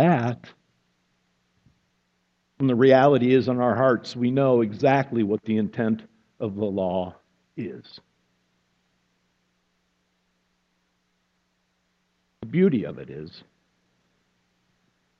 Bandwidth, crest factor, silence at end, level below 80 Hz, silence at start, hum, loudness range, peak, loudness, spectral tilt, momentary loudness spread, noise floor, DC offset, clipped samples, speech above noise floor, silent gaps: 7.6 kHz; 22 dB; 1.8 s; -68 dBFS; 0 s; 60 Hz at -55 dBFS; 14 LU; -4 dBFS; -22 LUFS; -8.5 dB/octave; 20 LU; -72 dBFS; under 0.1%; under 0.1%; 50 dB; none